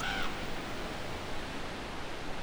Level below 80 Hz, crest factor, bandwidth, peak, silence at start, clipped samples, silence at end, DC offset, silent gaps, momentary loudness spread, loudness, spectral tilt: -44 dBFS; 14 dB; over 20 kHz; -22 dBFS; 0 s; under 0.1%; 0 s; under 0.1%; none; 5 LU; -39 LUFS; -4 dB/octave